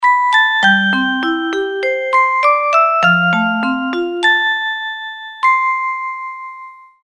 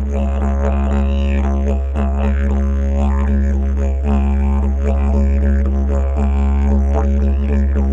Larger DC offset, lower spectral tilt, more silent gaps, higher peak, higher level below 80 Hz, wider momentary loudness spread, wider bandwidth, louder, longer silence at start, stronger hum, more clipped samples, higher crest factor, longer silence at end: neither; second, -4.5 dB/octave vs -9 dB/octave; neither; first, 0 dBFS vs -4 dBFS; second, -60 dBFS vs -16 dBFS; first, 13 LU vs 3 LU; first, 10.5 kHz vs 7.2 kHz; first, -14 LUFS vs -17 LUFS; about the same, 0 s vs 0 s; neither; neither; about the same, 14 dB vs 10 dB; first, 0.25 s vs 0 s